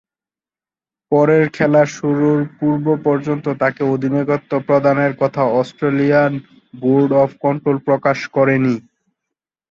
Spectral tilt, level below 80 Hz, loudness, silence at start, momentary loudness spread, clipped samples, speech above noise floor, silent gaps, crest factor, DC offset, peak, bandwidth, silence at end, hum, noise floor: -8 dB/octave; -58 dBFS; -16 LUFS; 1.1 s; 5 LU; under 0.1%; over 75 dB; none; 14 dB; under 0.1%; -2 dBFS; 7.4 kHz; 0.9 s; none; under -90 dBFS